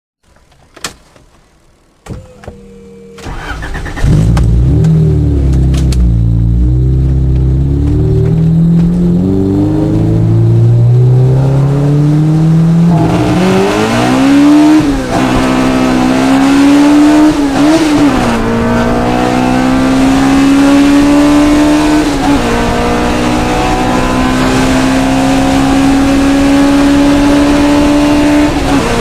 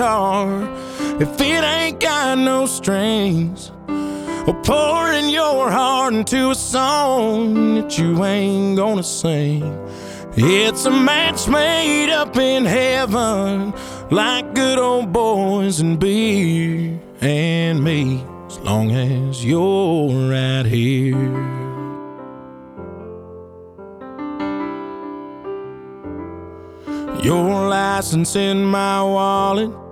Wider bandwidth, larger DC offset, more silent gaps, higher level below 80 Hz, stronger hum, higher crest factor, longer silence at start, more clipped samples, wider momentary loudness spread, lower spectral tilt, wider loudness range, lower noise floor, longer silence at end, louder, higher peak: about the same, 15 kHz vs 16.5 kHz; neither; neither; first, -18 dBFS vs -44 dBFS; neither; second, 8 dB vs 18 dB; first, 0.85 s vs 0 s; neither; second, 5 LU vs 16 LU; first, -6.5 dB/octave vs -5 dB/octave; second, 3 LU vs 13 LU; first, -46 dBFS vs -38 dBFS; about the same, 0 s vs 0 s; first, -9 LUFS vs -17 LUFS; about the same, 0 dBFS vs 0 dBFS